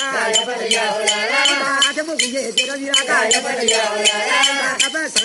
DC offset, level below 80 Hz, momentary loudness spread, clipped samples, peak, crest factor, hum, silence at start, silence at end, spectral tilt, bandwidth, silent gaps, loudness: under 0.1%; -68 dBFS; 4 LU; under 0.1%; 0 dBFS; 18 dB; none; 0 s; 0 s; 0.5 dB/octave; 11.5 kHz; none; -16 LUFS